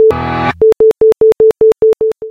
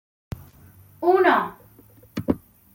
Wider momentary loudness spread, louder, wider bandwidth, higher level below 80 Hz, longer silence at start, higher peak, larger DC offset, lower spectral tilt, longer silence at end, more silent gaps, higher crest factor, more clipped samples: second, 6 LU vs 22 LU; first, -9 LUFS vs -22 LUFS; second, 5.8 kHz vs 17 kHz; first, -38 dBFS vs -52 dBFS; second, 0 s vs 0.4 s; about the same, -2 dBFS vs -4 dBFS; neither; about the same, -7 dB/octave vs -7 dB/octave; second, 0 s vs 0.4 s; neither; second, 8 dB vs 20 dB; neither